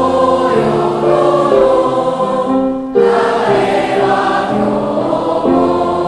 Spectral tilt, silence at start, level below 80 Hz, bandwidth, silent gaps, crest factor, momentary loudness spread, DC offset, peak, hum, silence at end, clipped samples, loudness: -6.5 dB/octave; 0 s; -42 dBFS; 11.5 kHz; none; 12 dB; 4 LU; under 0.1%; 0 dBFS; none; 0 s; under 0.1%; -13 LUFS